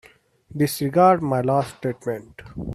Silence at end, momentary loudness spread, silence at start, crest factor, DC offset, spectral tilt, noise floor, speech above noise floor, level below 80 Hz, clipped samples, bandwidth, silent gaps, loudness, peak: 0 s; 18 LU; 0.55 s; 18 dB; under 0.1%; -6.5 dB/octave; -50 dBFS; 28 dB; -50 dBFS; under 0.1%; 15.5 kHz; none; -21 LUFS; -4 dBFS